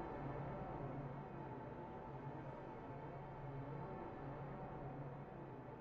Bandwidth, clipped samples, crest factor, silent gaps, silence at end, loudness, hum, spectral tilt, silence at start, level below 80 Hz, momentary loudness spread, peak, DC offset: 6 kHz; under 0.1%; 16 dB; none; 0 s; -51 LUFS; none; -8 dB/octave; 0 s; -64 dBFS; 4 LU; -34 dBFS; under 0.1%